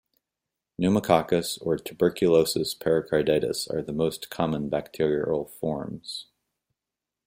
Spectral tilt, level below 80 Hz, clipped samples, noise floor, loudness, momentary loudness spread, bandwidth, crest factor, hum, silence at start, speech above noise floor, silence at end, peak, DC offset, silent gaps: -5.5 dB/octave; -58 dBFS; under 0.1%; -88 dBFS; -26 LUFS; 10 LU; 16.5 kHz; 22 dB; none; 0.8 s; 63 dB; 1.05 s; -6 dBFS; under 0.1%; none